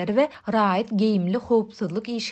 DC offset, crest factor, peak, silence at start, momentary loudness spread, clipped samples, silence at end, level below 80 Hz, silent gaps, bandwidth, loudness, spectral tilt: under 0.1%; 14 dB; -8 dBFS; 0 s; 7 LU; under 0.1%; 0 s; -62 dBFS; none; 8.4 kHz; -23 LUFS; -6.5 dB/octave